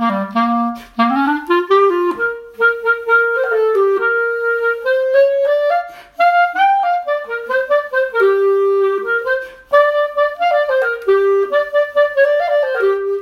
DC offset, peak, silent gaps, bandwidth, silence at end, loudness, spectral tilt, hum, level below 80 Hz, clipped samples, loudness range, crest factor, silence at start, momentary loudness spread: under 0.1%; -2 dBFS; none; 13.5 kHz; 0 s; -15 LUFS; -5.5 dB/octave; none; -58 dBFS; under 0.1%; 1 LU; 14 dB; 0 s; 5 LU